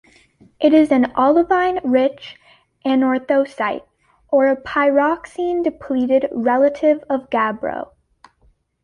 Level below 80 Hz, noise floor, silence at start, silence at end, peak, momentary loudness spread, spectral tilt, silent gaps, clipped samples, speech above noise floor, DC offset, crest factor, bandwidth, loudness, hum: -56 dBFS; -58 dBFS; 0.6 s; 1 s; -2 dBFS; 11 LU; -6 dB/octave; none; under 0.1%; 41 dB; under 0.1%; 16 dB; 10.5 kHz; -18 LUFS; none